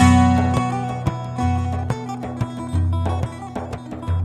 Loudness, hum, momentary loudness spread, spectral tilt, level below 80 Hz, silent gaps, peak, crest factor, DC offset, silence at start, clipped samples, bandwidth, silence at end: -22 LUFS; none; 13 LU; -7 dB/octave; -34 dBFS; none; 0 dBFS; 20 dB; under 0.1%; 0 s; under 0.1%; 11 kHz; 0 s